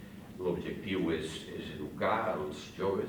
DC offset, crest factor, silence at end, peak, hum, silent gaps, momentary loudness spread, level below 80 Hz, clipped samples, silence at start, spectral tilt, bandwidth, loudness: under 0.1%; 18 dB; 0 s; -18 dBFS; none; none; 10 LU; -60 dBFS; under 0.1%; 0 s; -6 dB/octave; over 20 kHz; -35 LUFS